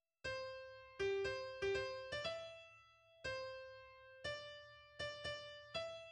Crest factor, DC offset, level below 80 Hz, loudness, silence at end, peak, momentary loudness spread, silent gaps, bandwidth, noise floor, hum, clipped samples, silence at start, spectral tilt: 18 dB; under 0.1%; -70 dBFS; -46 LUFS; 0 s; -30 dBFS; 16 LU; none; 10.5 kHz; -67 dBFS; none; under 0.1%; 0.25 s; -3.5 dB/octave